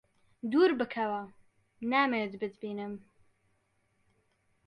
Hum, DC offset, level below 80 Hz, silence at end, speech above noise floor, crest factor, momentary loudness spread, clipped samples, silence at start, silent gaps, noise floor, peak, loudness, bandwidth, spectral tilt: none; under 0.1%; -78 dBFS; 1.7 s; 44 dB; 18 dB; 16 LU; under 0.1%; 0.45 s; none; -74 dBFS; -16 dBFS; -31 LUFS; 9 kHz; -7 dB/octave